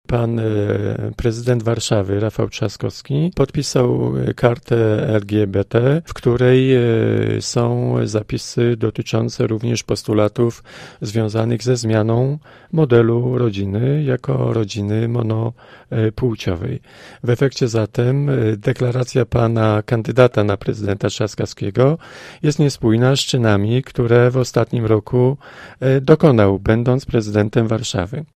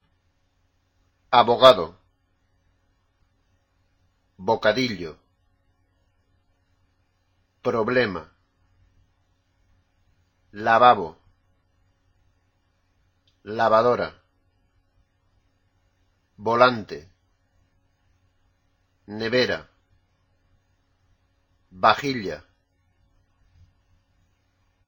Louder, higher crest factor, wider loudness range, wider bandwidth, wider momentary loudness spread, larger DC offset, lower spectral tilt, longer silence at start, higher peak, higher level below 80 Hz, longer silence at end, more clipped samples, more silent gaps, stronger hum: first, -18 LUFS vs -21 LUFS; second, 16 dB vs 26 dB; second, 4 LU vs 8 LU; second, 12 kHz vs 16.5 kHz; second, 8 LU vs 21 LU; neither; first, -6.5 dB/octave vs -5 dB/octave; second, 0.1 s vs 1.3 s; about the same, 0 dBFS vs 0 dBFS; first, -42 dBFS vs -60 dBFS; second, 0.15 s vs 2.5 s; neither; neither; neither